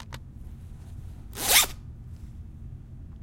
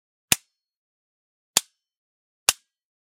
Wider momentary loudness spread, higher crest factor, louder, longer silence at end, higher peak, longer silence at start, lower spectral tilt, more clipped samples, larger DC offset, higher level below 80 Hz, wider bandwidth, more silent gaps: first, 25 LU vs 1 LU; about the same, 28 dB vs 30 dB; first, -21 LUFS vs -24 LUFS; second, 0 s vs 0.55 s; second, -4 dBFS vs 0 dBFS; second, 0 s vs 0.3 s; about the same, -0.5 dB/octave vs 0.5 dB/octave; neither; neither; first, -44 dBFS vs -60 dBFS; about the same, 16.5 kHz vs 16 kHz; second, none vs 0.77-1.54 s, 1.97-2.46 s